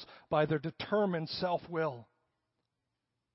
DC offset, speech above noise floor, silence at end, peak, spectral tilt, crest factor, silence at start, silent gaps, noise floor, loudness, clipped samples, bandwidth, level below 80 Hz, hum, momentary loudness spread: under 0.1%; 53 dB; 1.3 s; -16 dBFS; -9.5 dB/octave; 20 dB; 0 s; none; -86 dBFS; -34 LUFS; under 0.1%; 5.8 kHz; -70 dBFS; none; 5 LU